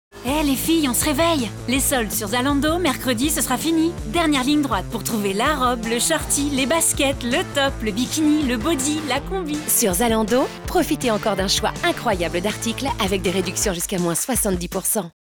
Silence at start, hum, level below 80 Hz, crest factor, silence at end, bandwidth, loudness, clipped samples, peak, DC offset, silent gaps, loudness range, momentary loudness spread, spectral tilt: 0.15 s; none; -36 dBFS; 12 dB; 0.1 s; over 20 kHz; -20 LUFS; under 0.1%; -8 dBFS; under 0.1%; none; 2 LU; 5 LU; -3.5 dB/octave